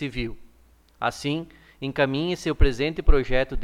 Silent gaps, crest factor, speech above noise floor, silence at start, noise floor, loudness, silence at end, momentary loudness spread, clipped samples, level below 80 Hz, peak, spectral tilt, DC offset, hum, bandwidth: none; 20 dB; 34 dB; 0 s; -56 dBFS; -26 LUFS; 0 s; 10 LU; under 0.1%; -26 dBFS; -2 dBFS; -6 dB/octave; under 0.1%; none; 10.5 kHz